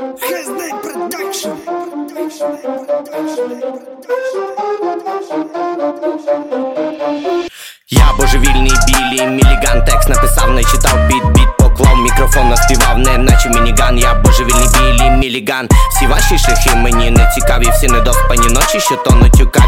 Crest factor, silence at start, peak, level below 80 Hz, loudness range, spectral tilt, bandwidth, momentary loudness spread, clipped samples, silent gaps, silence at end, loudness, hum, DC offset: 10 dB; 0 s; 0 dBFS; -12 dBFS; 10 LU; -4 dB/octave; 16.5 kHz; 11 LU; under 0.1%; none; 0 s; -12 LUFS; none; under 0.1%